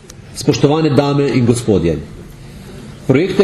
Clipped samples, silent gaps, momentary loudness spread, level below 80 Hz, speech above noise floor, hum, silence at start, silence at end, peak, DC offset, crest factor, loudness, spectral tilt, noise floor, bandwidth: under 0.1%; none; 21 LU; -38 dBFS; 21 dB; none; 0.1 s; 0 s; 0 dBFS; under 0.1%; 14 dB; -14 LUFS; -6.5 dB/octave; -33 dBFS; 13.5 kHz